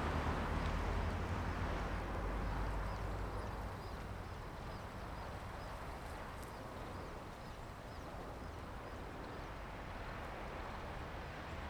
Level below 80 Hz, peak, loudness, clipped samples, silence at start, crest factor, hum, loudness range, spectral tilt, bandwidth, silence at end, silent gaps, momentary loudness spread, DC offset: -48 dBFS; -26 dBFS; -45 LUFS; under 0.1%; 0 s; 18 dB; none; 7 LU; -6 dB/octave; over 20 kHz; 0 s; none; 9 LU; under 0.1%